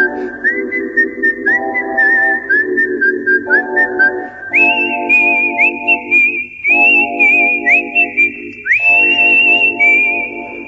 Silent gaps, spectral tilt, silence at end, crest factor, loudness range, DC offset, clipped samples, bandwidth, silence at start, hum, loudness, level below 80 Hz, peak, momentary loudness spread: none; -3.5 dB/octave; 0 s; 12 dB; 4 LU; under 0.1%; under 0.1%; 8 kHz; 0 s; none; -10 LUFS; -54 dBFS; 0 dBFS; 8 LU